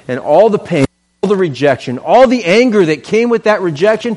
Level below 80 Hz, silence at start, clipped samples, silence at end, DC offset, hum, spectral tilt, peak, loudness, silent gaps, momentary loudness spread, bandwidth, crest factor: -50 dBFS; 0.1 s; under 0.1%; 0 s; under 0.1%; none; -6 dB/octave; 0 dBFS; -12 LUFS; none; 7 LU; 11.5 kHz; 12 dB